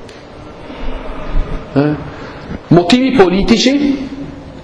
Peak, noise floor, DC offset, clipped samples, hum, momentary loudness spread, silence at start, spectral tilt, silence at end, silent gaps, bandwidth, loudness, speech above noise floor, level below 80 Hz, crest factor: 0 dBFS; -32 dBFS; under 0.1%; 0.3%; none; 21 LU; 0 s; -5.5 dB/octave; 0 s; none; 11 kHz; -13 LUFS; 21 dB; -24 dBFS; 14 dB